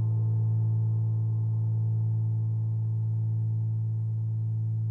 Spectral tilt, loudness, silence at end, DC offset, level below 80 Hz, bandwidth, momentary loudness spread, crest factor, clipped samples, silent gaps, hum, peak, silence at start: -13 dB/octave; -28 LUFS; 0 s; under 0.1%; -66 dBFS; 1.1 kHz; 3 LU; 6 dB; under 0.1%; none; none; -20 dBFS; 0 s